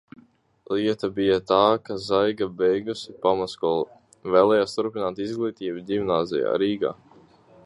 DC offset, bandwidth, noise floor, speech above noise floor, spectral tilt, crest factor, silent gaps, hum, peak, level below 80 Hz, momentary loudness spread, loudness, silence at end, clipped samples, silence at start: under 0.1%; 11 kHz; -56 dBFS; 33 dB; -6 dB/octave; 20 dB; none; none; -4 dBFS; -60 dBFS; 9 LU; -24 LUFS; 0.7 s; under 0.1%; 0.7 s